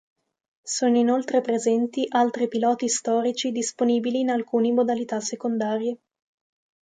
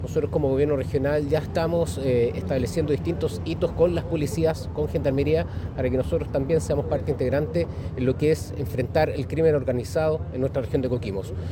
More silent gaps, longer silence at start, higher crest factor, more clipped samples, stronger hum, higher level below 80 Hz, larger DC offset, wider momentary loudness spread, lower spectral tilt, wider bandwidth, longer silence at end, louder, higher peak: neither; first, 0.65 s vs 0 s; about the same, 16 dB vs 16 dB; neither; neither; second, -76 dBFS vs -38 dBFS; neither; about the same, 6 LU vs 5 LU; second, -3.5 dB/octave vs -7.5 dB/octave; second, 9.4 kHz vs 17 kHz; first, 0.95 s vs 0 s; about the same, -24 LUFS vs -25 LUFS; about the same, -8 dBFS vs -8 dBFS